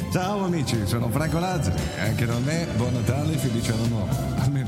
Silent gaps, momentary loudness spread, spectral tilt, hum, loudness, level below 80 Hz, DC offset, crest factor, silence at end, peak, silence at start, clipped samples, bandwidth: none; 2 LU; -6 dB/octave; none; -25 LUFS; -40 dBFS; under 0.1%; 14 dB; 0 s; -10 dBFS; 0 s; under 0.1%; 16.5 kHz